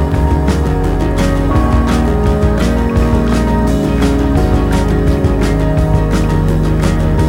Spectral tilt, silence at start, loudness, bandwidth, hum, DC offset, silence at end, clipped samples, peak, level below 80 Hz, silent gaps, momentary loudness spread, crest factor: -7.5 dB/octave; 0 s; -13 LUFS; 15.5 kHz; none; under 0.1%; 0 s; under 0.1%; 0 dBFS; -16 dBFS; none; 1 LU; 10 dB